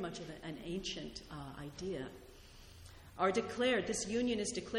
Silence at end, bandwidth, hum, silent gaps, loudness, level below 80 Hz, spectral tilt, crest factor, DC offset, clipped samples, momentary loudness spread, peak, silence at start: 0 s; 16.5 kHz; none; none; -38 LUFS; -60 dBFS; -3.5 dB/octave; 20 dB; under 0.1%; under 0.1%; 22 LU; -20 dBFS; 0 s